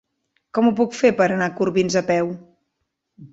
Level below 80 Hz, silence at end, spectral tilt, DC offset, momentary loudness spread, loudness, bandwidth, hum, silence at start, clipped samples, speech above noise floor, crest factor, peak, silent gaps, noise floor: -60 dBFS; 0.05 s; -5.5 dB/octave; under 0.1%; 9 LU; -20 LUFS; 8 kHz; none; 0.55 s; under 0.1%; 57 dB; 18 dB; -2 dBFS; none; -76 dBFS